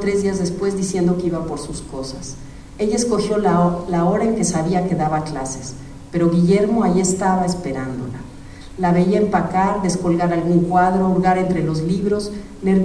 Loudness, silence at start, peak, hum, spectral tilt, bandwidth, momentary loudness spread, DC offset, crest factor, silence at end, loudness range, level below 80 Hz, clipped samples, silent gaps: -19 LUFS; 0 s; -4 dBFS; none; -6.5 dB/octave; 11 kHz; 14 LU; under 0.1%; 16 dB; 0 s; 3 LU; -40 dBFS; under 0.1%; none